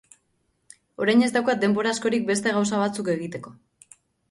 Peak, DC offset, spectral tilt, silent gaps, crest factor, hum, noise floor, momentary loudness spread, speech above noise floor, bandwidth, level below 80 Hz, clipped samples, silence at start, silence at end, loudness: -8 dBFS; under 0.1%; -4.5 dB/octave; none; 18 dB; none; -71 dBFS; 8 LU; 48 dB; 11.5 kHz; -66 dBFS; under 0.1%; 1 s; 0.8 s; -23 LUFS